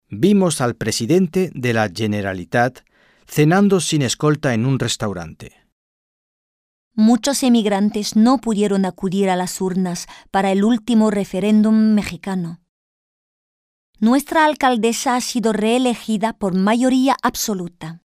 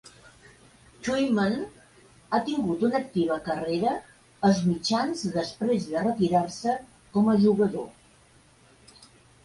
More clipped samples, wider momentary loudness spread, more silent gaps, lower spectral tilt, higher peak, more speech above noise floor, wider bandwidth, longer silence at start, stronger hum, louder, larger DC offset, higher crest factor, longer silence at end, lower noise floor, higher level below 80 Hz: neither; about the same, 8 LU vs 9 LU; first, 5.72-6.91 s, 12.69-13.93 s vs none; about the same, -5 dB/octave vs -6 dB/octave; first, -2 dBFS vs -10 dBFS; first, over 73 dB vs 33 dB; first, 15.5 kHz vs 11.5 kHz; second, 0.1 s vs 1 s; neither; first, -18 LUFS vs -26 LUFS; neither; about the same, 16 dB vs 18 dB; second, 0.05 s vs 0.4 s; first, under -90 dBFS vs -58 dBFS; first, -52 dBFS vs -60 dBFS